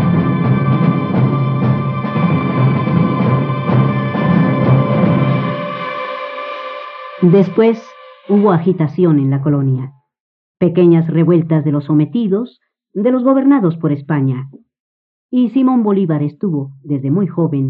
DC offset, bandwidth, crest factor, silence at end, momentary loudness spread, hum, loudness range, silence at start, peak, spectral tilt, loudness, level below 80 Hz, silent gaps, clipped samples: under 0.1%; 5.4 kHz; 12 dB; 0 s; 11 LU; none; 3 LU; 0 s; 0 dBFS; -11 dB/octave; -14 LUFS; -56 dBFS; 10.20-10.55 s, 14.80-15.29 s; under 0.1%